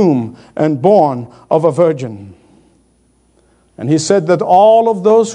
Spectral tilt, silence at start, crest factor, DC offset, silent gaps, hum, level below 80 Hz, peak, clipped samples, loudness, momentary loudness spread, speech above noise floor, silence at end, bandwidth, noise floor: -6.5 dB/octave; 0 s; 12 dB; under 0.1%; none; none; -58 dBFS; 0 dBFS; 0.1%; -12 LUFS; 16 LU; 43 dB; 0 s; 10.5 kHz; -54 dBFS